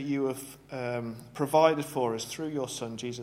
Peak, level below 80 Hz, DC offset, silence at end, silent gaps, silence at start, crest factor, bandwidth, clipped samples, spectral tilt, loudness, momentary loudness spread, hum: -8 dBFS; -66 dBFS; under 0.1%; 0 s; none; 0 s; 22 dB; 16.5 kHz; under 0.1%; -5 dB/octave; -30 LUFS; 14 LU; none